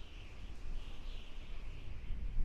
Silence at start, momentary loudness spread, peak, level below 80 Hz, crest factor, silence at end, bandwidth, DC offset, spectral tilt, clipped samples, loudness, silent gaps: 0 s; 5 LU; -22 dBFS; -42 dBFS; 16 dB; 0 s; 7 kHz; under 0.1%; -5.5 dB/octave; under 0.1%; -51 LUFS; none